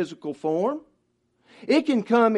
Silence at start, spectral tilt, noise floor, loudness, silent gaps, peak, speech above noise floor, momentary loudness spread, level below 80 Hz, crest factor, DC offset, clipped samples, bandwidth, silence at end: 0 s; -6 dB/octave; -70 dBFS; -24 LUFS; none; -8 dBFS; 47 dB; 13 LU; -76 dBFS; 18 dB; under 0.1%; under 0.1%; 10.5 kHz; 0 s